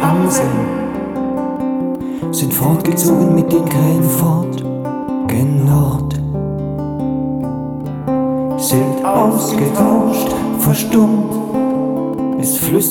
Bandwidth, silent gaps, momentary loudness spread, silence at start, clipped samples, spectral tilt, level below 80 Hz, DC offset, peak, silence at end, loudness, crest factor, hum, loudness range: 19.5 kHz; none; 8 LU; 0 s; under 0.1%; -6.5 dB/octave; -40 dBFS; under 0.1%; -2 dBFS; 0 s; -15 LUFS; 14 dB; none; 3 LU